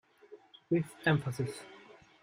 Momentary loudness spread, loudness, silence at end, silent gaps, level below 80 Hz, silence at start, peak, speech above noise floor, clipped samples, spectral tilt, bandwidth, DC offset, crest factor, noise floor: 23 LU; -33 LUFS; 0.45 s; none; -68 dBFS; 0.3 s; -14 dBFS; 25 dB; under 0.1%; -6.5 dB/octave; 16 kHz; under 0.1%; 22 dB; -57 dBFS